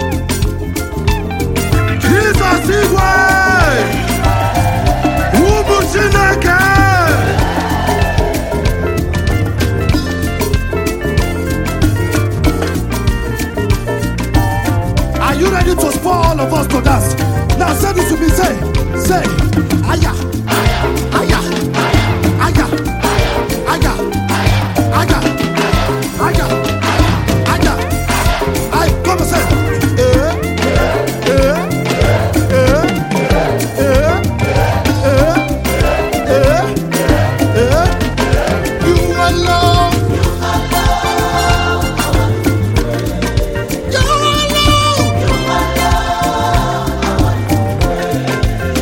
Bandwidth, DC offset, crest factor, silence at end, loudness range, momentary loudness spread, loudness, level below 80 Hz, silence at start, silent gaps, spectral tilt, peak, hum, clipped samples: 17 kHz; under 0.1%; 12 dB; 0 s; 4 LU; 6 LU; -13 LUFS; -20 dBFS; 0 s; none; -5.5 dB/octave; 0 dBFS; none; under 0.1%